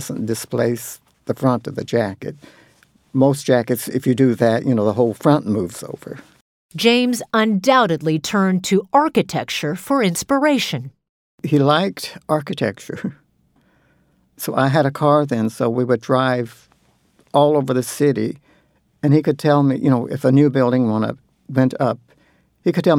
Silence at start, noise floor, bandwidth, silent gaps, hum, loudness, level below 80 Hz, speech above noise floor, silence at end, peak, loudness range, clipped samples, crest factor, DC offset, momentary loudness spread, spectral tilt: 0 s; -60 dBFS; 18 kHz; 6.41-6.69 s, 11.09-11.38 s; none; -18 LUFS; -62 dBFS; 42 dB; 0 s; -2 dBFS; 5 LU; under 0.1%; 18 dB; under 0.1%; 13 LU; -6 dB/octave